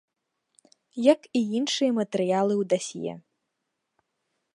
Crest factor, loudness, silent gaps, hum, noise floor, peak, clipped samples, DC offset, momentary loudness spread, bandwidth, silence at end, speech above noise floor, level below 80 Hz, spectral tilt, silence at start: 22 dB; -25 LUFS; none; none; -81 dBFS; -6 dBFS; under 0.1%; under 0.1%; 13 LU; 11 kHz; 1.4 s; 56 dB; -78 dBFS; -5 dB/octave; 0.95 s